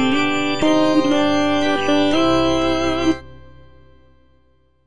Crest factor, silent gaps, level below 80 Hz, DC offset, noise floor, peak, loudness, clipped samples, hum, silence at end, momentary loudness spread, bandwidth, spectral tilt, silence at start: 14 dB; none; -42 dBFS; under 0.1%; -59 dBFS; -6 dBFS; -17 LUFS; under 0.1%; none; 0 s; 3 LU; 10 kHz; -4.5 dB/octave; 0 s